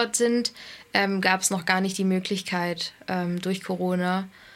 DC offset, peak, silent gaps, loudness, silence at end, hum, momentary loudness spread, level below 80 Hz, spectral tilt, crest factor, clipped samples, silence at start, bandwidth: under 0.1%; -4 dBFS; none; -25 LUFS; 0.05 s; none; 7 LU; -68 dBFS; -4 dB/octave; 22 dB; under 0.1%; 0 s; 16 kHz